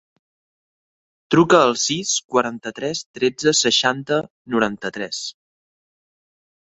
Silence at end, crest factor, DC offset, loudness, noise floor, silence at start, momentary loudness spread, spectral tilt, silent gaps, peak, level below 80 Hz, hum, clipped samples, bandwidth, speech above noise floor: 1.35 s; 20 dB; under 0.1%; -19 LUFS; under -90 dBFS; 1.3 s; 13 LU; -3 dB/octave; 2.24-2.29 s, 3.06-3.14 s, 4.30-4.45 s; -2 dBFS; -60 dBFS; none; under 0.1%; 8.4 kHz; over 71 dB